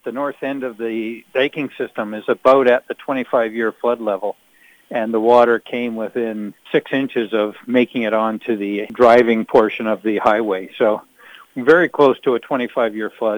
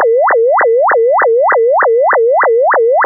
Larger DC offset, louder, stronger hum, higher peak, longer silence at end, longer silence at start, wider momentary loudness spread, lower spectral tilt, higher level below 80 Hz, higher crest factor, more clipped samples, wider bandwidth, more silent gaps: neither; second, -18 LUFS vs -9 LUFS; neither; about the same, -2 dBFS vs -4 dBFS; about the same, 0 s vs 0 s; about the same, 0.05 s vs 0 s; first, 12 LU vs 0 LU; first, -6.5 dB/octave vs 9 dB/octave; first, -62 dBFS vs -78 dBFS; first, 16 dB vs 6 dB; neither; first, over 20 kHz vs 2.1 kHz; neither